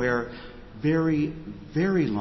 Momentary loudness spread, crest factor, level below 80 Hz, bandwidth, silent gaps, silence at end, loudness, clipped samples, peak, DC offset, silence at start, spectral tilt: 17 LU; 14 dB; -48 dBFS; 6 kHz; none; 0 s; -26 LUFS; under 0.1%; -12 dBFS; under 0.1%; 0 s; -8 dB/octave